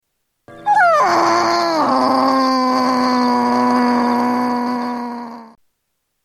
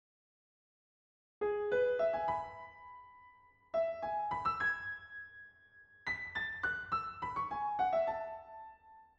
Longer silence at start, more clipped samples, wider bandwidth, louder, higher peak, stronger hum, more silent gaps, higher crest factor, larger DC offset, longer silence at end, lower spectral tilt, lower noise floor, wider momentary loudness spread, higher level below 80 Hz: second, 0.5 s vs 1.4 s; neither; first, 12.5 kHz vs 7.8 kHz; first, -15 LUFS vs -36 LUFS; first, -2 dBFS vs -22 dBFS; neither; neither; about the same, 14 dB vs 16 dB; neither; first, 0.8 s vs 0.15 s; second, -4 dB/octave vs -5.5 dB/octave; first, -72 dBFS vs -63 dBFS; second, 11 LU vs 19 LU; first, -62 dBFS vs -68 dBFS